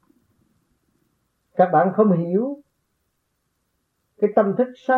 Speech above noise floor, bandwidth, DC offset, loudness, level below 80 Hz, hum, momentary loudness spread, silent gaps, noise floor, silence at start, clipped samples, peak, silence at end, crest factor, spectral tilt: 54 dB; 4.3 kHz; under 0.1%; -20 LUFS; -74 dBFS; none; 12 LU; none; -73 dBFS; 1.55 s; under 0.1%; -4 dBFS; 0 s; 20 dB; -10.5 dB/octave